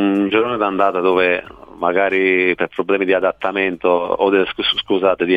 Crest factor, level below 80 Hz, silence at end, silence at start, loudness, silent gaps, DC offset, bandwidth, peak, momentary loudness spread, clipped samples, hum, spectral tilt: 16 dB; -52 dBFS; 0 s; 0 s; -17 LUFS; none; under 0.1%; 5 kHz; -2 dBFS; 4 LU; under 0.1%; none; -6.5 dB/octave